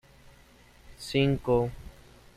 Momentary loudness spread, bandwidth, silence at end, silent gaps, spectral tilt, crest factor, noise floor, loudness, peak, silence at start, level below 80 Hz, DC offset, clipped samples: 18 LU; 14.5 kHz; 0.45 s; none; -6.5 dB/octave; 18 dB; -56 dBFS; -28 LUFS; -12 dBFS; 0.85 s; -50 dBFS; under 0.1%; under 0.1%